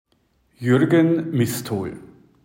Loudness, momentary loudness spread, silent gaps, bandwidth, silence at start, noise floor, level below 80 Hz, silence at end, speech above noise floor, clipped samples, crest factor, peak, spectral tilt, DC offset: -20 LUFS; 14 LU; none; 16.5 kHz; 0.6 s; -64 dBFS; -60 dBFS; 0.4 s; 45 dB; under 0.1%; 16 dB; -6 dBFS; -6.5 dB/octave; under 0.1%